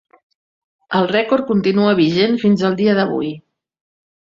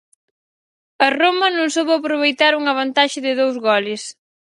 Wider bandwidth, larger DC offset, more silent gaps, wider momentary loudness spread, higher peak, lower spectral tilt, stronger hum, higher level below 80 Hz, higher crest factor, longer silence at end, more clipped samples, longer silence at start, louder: second, 7.2 kHz vs 11.5 kHz; neither; neither; first, 8 LU vs 4 LU; about the same, -2 dBFS vs 0 dBFS; first, -7.5 dB/octave vs -2 dB/octave; neither; first, -58 dBFS vs -74 dBFS; about the same, 16 dB vs 18 dB; first, 0.85 s vs 0.45 s; neither; about the same, 0.9 s vs 1 s; about the same, -16 LUFS vs -17 LUFS